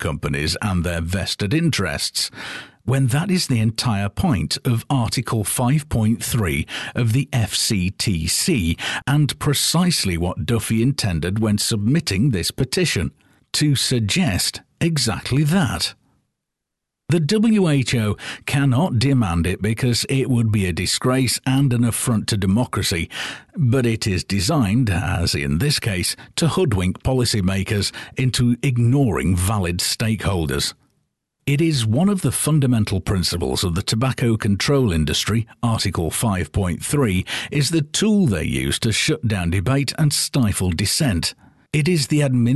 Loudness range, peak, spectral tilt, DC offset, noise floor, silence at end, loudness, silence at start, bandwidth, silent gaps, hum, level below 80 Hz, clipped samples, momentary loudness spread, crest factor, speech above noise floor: 2 LU; -8 dBFS; -5 dB/octave; under 0.1%; -81 dBFS; 0 s; -20 LUFS; 0 s; 12.5 kHz; none; none; -36 dBFS; under 0.1%; 5 LU; 12 dB; 62 dB